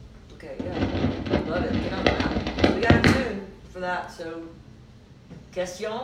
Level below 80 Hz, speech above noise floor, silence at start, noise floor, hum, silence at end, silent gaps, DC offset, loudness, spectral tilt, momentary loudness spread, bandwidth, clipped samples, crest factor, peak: -38 dBFS; 20 dB; 0 s; -49 dBFS; none; 0 s; none; under 0.1%; -25 LUFS; -6 dB/octave; 20 LU; 15 kHz; under 0.1%; 22 dB; -4 dBFS